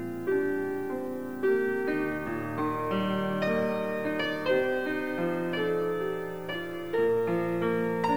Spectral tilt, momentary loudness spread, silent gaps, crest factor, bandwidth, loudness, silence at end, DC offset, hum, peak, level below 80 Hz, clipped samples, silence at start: -7 dB/octave; 6 LU; none; 14 dB; over 20 kHz; -29 LUFS; 0 s; 0.4%; none; -14 dBFS; -62 dBFS; under 0.1%; 0 s